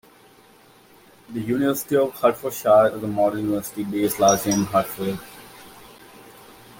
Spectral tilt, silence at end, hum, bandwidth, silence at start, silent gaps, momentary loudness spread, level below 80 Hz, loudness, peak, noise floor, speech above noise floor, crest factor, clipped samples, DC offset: -4.5 dB/octave; 0.3 s; none; 17 kHz; 1.3 s; none; 16 LU; -58 dBFS; -21 LUFS; -4 dBFS; -52 dBFS; 31 dB; 18 dB; under 0.1%; under 0.1%